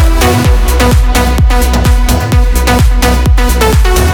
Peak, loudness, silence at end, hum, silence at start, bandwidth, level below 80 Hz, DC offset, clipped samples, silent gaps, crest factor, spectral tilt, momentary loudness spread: 0 dBFS; -9 LUFS; 0 s; none; 0 s; 19 kHz; -8 dBFS; under 0.1%; 0.2%; none; 6 dB; -5 dB/octave; 2 LU